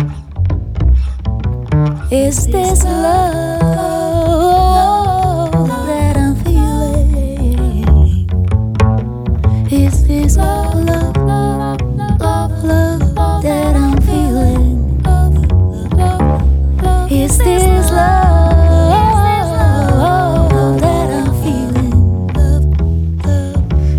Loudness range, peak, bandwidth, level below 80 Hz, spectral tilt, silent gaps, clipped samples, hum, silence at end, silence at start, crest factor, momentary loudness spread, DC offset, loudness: 3 LU; 0 dBFS; 15.5 kHz; -16 dBFS; -7 dB/octave; none; under 0.1%; none; 0 s; 0 s; 12 dB; 5 LU; under 0.1%; -13 LUFS